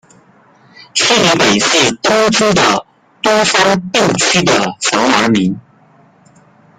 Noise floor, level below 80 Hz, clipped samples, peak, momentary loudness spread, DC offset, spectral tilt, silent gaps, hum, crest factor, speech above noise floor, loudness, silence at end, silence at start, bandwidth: -47 dBFS; -48 dBFS; under 0.1%; 0 dBFS; 6 LU; under 0.1%; -3 dB/octave; none; none; 14 dB; 35 dB; -11 LUFS; 1.2 s; 0.95 s; 15.5 kHz